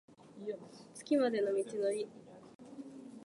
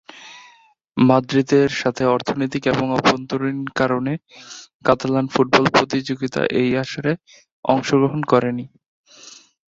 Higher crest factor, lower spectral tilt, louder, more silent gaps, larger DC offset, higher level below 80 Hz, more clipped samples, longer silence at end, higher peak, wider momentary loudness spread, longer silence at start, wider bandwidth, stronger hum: about the same, 18 dB vs 20 dB; about the same, -5 dB/octave vs -6 dB/octave; second, -36 LUFS vs -19 LUFS; second, 2.55-2.59 s vs 4.74-4.80 s, 7.52-7.63 s, 8.86-9.04 s; neither; second, -86 dBFS vs -54 dBFS; neither; second, 0 s vs 0.35 s; second, -20 dBFS vs 0 dBFS; first, 22 LU vs 14 LU; about the same, 0.25 s vs 0.15 s; first, 11.5 kHz vs 7.8 kHz; neither